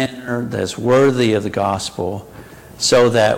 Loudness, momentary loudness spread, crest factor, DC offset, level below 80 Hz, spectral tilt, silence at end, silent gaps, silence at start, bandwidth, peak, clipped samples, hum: -17 LUFS; 12 LU; 14 dB; under 0.1%; -50 dBFS; -4.5 dB/octave; 0 s; none; 0 s; 16.5 kHz; -4 dBFS; under 0.1%; none